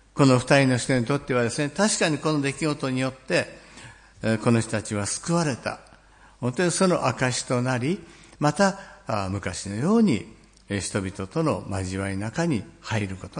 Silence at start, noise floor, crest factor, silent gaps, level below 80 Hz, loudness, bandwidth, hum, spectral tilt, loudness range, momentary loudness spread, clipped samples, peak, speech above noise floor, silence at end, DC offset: 0.15 s; -53 dBFS; 20 dB; none; -56 dBFS; -25 LUFS; 10.5 kHz; none; -5 dB/octave; 3 LU; 11 LU; under 0.1%; -4 dBFS; 29 dB; 0 s; under 0.1%